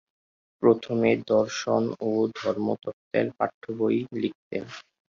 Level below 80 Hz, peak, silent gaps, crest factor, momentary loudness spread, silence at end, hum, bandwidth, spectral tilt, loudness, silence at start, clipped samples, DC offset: -66 dBFS; -6 dBFS; 2.93-3.11 s, 3.54-3.61 s, 4.35-4.51 s; 20 dB; 12 LU; 0.3 s; none; 7.4 kHz; -6 dB/octave; -26 LUFS; 0.6 s; under 0.1%; under 0.1%